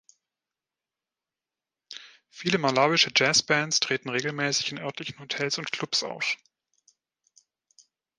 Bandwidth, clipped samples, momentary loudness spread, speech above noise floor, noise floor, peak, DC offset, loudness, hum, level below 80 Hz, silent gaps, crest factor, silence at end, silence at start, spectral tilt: 11 kHz; under 0.1%; 15 LU; over 64 dB; under -90 dBFS; -6 dBFS; under 0.1%; -25 LUFS; none; -72 dBFS; none; 24 dB; 1.85 s; 1.9 s; -2.5 dB/octave